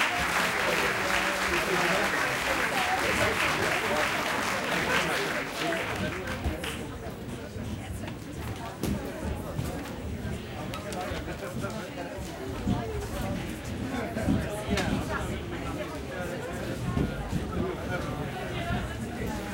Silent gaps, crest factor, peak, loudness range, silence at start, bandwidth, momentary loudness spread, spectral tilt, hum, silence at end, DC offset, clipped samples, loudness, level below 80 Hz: none; 20 dB; -12 dBFS; 9 LU; 0 s; 17 kHz; 11 LU; -4 dB/octave; none; 0 s; under 0.1%; under 0.1%; -30 LUFS; -44 dBFS